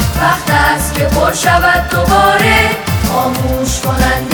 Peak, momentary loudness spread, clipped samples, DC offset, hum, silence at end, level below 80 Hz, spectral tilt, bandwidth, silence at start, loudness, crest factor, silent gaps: 0 dBFS; 6 LU; under 0.1%; under 0.1%; none; 0 s; -22 dBFS; -4 dB/octave; over 20 kHz; 0 s; -11 LUFS; 12 dB; none